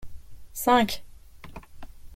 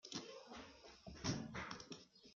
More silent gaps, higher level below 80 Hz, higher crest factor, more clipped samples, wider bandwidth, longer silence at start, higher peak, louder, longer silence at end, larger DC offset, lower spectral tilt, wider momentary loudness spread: neither; first, -48 dBFS vs -68 dBFS; about the same, 22 dB vs 24 dB; neither; first, 16.5 kHz vs 7.8 kHz; about the same, 0 s vs 0.05 s; first, -6 dBFS vs -28 dBFS; first, -24 LUFS vs -50 LUFS; about the same, 0 s vs 0 s; neither; about the same, -3.5 dB/octave vs -4 dB/octave; first, 25 LU vs 13 LU